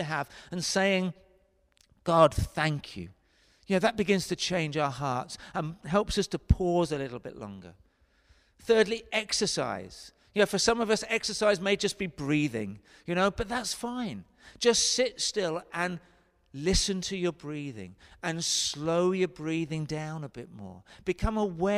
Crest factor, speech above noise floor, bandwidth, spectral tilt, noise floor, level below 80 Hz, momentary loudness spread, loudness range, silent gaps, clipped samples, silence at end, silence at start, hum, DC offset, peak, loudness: 22 dB; 37 dB; 15.5 kHz; -4 dB/octave; -66 dBFS; -44 dBFS; 17 LU; 3 LU; none; under 0.1%; 0 s; 0 s; none; under 0.1%; -8 dBFS; -29 LUFS